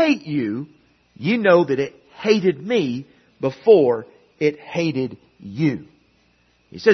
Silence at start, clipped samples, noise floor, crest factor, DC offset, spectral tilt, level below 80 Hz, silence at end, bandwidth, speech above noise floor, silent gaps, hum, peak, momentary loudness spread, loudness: 0 s; under 0.1%; -60 dBFS; 20 dB; under 0.1%; -6.5 dB/octave; -64 dBFS; 0 s; 6.4 kHz; 41 dB; none; none; -2 dBFS; 16 LU; -20 LUFS